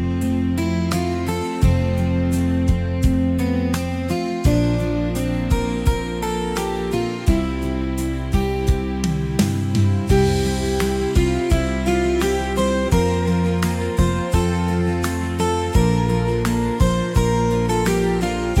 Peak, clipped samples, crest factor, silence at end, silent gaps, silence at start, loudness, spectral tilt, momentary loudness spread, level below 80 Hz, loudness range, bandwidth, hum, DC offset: -6 dBFS; under 0.1%; 14 dB; 0 s; none; 0 s; -20 LUFS; -6.5 dB/octave; 5 LU; -26 dBFS; 3 LU; 16.5 kHz; none; under 0.1%